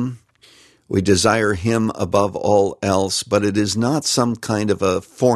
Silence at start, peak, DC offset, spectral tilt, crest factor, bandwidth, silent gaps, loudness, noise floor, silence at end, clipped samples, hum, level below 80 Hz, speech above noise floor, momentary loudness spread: 0 s; -2 dBFS; under 0.1%; -4.5 dB/octave; 18 dB; 13 kHz; none; -18 LUFS; -51 dBFS; 0 s; under 0.1%; none; -50 dBFS; 33 dB; 5 LU